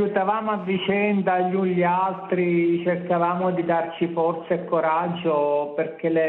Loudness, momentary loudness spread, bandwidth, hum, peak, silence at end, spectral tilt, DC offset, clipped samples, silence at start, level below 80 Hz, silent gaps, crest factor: -23 LUFS; 4 LU; 4.1 kHz; none; -6 dBFS; 0 s; -11 dB/octave; under 0.1%; under 0.1%; 0 s; -68 dBFS; none; 16 dB